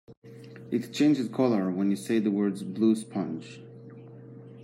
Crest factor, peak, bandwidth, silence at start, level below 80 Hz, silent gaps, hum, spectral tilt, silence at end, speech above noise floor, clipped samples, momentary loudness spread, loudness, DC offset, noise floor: 18 dB; -12 dBFS; 15 kHz; 0.1 s; -76 dBFS; 0.17-0.22 s; none; -6.5 dB/octave; 0 s; 20 dB; under 0.1%; 22 LU; -27 LUFS; under 0.1%; -46 dBFS